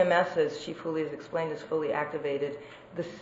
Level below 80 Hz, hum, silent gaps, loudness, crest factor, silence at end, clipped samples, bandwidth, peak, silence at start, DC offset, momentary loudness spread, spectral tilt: -70 dBFS; none; none; -31 LUFS; 20 dB; 0 s; under 0.1%; 8 kHz; -10 dBFS; 0 s; under 0.1%; 12 LU; -5.5 dB/octave